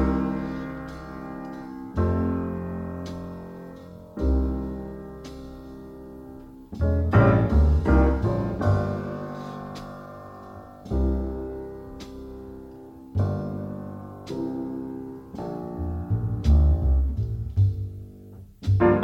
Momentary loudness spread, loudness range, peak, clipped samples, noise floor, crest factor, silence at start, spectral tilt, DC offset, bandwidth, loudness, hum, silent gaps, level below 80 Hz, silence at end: 21 LU; 10 LU; -6 dBFS; under 0.1%; -45 dBFS; 20 dB; 0 s; -9.5 dB/octave; under 0.1%; 6.6 kHz; -26 LUFS; none; none; -30 dBFS; 0 s